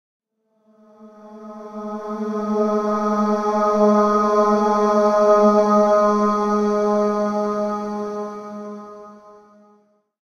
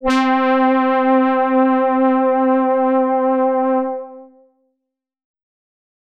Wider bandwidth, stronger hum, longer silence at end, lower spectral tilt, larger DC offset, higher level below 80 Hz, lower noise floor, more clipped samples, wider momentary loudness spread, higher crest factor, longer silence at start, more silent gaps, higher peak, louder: second, 7 kHz vs 8 kHz; neither; second, 0.95 s vs 1.8 s; first, -7 dB/octave vs -5 dB/octave; neither; second, -60 dBFS vs -52 dBFS; second, -63 dBFS vs -79 dBFS; neither; first, 18 LU vs 4 LU; first, 16 dB vs 10 dB; first, 1 s vs 0 s; neither; first, -4 dBFS vs -8 dBFS; second, -18 LUFS vs -15 LUFS